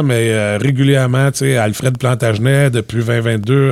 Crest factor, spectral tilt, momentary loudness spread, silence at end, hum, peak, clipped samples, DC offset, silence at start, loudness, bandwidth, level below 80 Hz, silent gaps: 12 dB; -6 dB/octave; 4 LU; 0 s; none; 0 dBFS; under 0.1%; under 0.1%; 0 s; -14 LUFS; 14 kHz; -48 dBFS; none